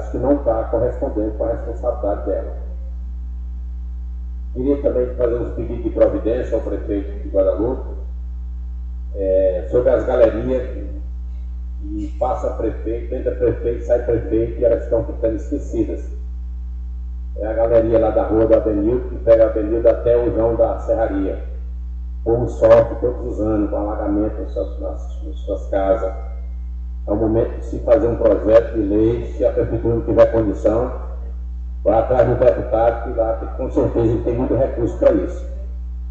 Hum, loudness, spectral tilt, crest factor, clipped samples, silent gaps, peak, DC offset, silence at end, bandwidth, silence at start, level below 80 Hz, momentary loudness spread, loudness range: 60 Hz at -25 dBFS; -19 LUFS; -9.5 dB/octave; 18 dB; under 0.1%; none; 0 dBFS; under 0.1%; 0 s; 7.4 kHz; 0 s; -26 dBFS; 16 LU; 7 LU